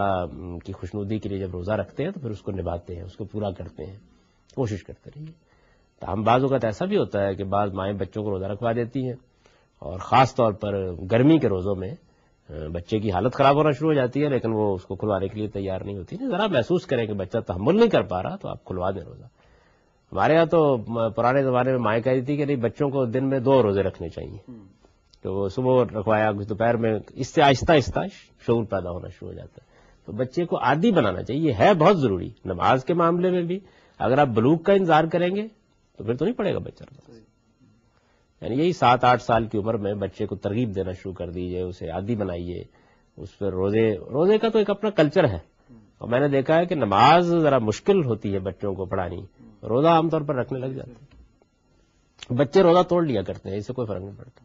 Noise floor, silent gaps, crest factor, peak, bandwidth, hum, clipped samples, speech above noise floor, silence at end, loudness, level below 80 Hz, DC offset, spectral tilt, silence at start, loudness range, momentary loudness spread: -63 dBFS; none; 20 dB; -4 dBFS; 7.6 kHz; none; under 0.1%; 40 dB; 0.2 s; -23 LUFS; -52 dBFS; under 0.1%; -5.5 dB/octave; 0 s; 8 LU; 17 LU